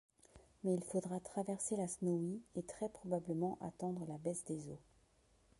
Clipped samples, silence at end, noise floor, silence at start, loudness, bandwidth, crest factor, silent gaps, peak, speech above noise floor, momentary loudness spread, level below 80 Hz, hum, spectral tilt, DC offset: under 0.1%; 0.8 s; -72 dBFS; 0.35 s; -42 LUFS; 11.5 kHz; 18 dB; none; -24 dBFS; 31 dB; 7 LU; -74 dBFS; none; -7 dB/octave; under 0.1%